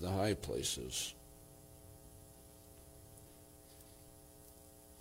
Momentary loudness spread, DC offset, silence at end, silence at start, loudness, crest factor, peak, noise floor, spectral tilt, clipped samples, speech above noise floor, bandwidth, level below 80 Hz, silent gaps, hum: 21 LU; under 0.1%; 0 s; 0 s; -39 LUFS; 20 dB; -24 dBFS; -59 dBFS; -3.5 dB/octave; under 0.1%; 21 dB; 16.5 kHz; -62 dBFS; none; none